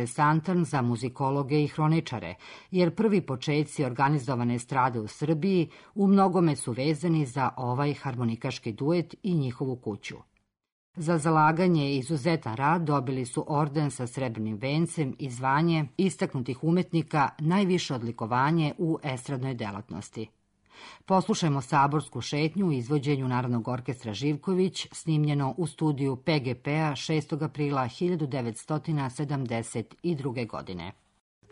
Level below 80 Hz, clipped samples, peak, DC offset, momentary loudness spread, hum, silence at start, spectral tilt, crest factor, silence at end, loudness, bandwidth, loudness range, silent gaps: -64 dBFS; under 0.1%; -12 dBFS; under 0.1%; 9 LU; none; 0 s; -6.5 dB/octave; 16 dB; 0.6 s; -28 LUFS; 11 kHz; 4 LU; 10.72-10.94 s